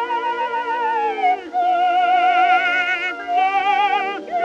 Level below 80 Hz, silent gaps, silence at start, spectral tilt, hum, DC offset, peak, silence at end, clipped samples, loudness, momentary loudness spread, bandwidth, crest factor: -66 dBFS; none; 0 s; -2 dB/octave; none; under 0.1%; -4 dBFS; 0 s; under 0.1%; -18 LUFS; 7 LU; 7.6 kHz; 14 dB